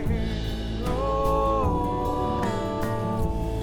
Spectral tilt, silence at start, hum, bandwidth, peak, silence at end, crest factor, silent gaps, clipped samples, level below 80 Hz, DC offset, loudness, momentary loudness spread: -7 dB/octave; 0 s; none; 19 kHz; -10 dBFS; 0 s; 14 dB; none; under 0.1%; -32 dBFS; under 0.1%; -27 LUFS; 6 LU